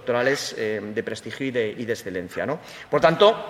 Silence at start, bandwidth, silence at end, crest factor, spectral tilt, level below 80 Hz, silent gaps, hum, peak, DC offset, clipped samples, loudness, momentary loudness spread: 0 s; 15.5 kHz; 0 s; 20 dB; -4.5 dB/octave; -62 dBFS; none; none; -4 dBFS; under 0.1%; under 0.1%; -24 LUFS; 11 LU